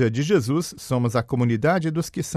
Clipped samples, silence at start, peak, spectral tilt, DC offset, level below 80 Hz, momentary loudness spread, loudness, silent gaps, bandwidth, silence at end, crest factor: under 0.1%; 0 s; -6 dBFS; -6.5 dB/octave; under 0.1%; -54 dBFS; 6 LU; -22 LUFS; none; 14.5 kHz; 0 s; 16 dB